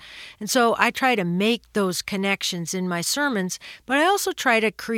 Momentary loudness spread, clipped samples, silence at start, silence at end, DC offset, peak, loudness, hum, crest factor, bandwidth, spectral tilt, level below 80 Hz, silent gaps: 8 LU; under 0.1%; 0 s; 0 s; under 0.1%; -2 dBFS; -22 LUFS; none; 22 dB; 17.5 kHz; -3.5 dB/octave; -62 dBFS; none